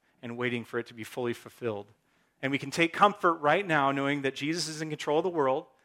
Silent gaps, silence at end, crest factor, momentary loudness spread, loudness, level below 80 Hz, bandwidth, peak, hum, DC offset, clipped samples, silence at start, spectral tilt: none; 0.2 s; 24 dB; 13 LU; -29 LUFS; -76 dBFS; 16.5 kHz; -6 dBFS; none; under 0.1%; under 0.1%; 0.25 s; -4.5 dB/octave